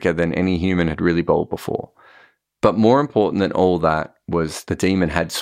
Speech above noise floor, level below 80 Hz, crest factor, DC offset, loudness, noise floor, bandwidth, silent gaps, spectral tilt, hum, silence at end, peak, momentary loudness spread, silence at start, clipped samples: 34 dB; -42 dBFS; 18 dB; under 0.1%; -19 LUFS; -53 dBFS; 16 kHz; none; -6.5 dB/octave; none; 0 s; -2 dBFS; 9 LU; 0 s; under 0.1%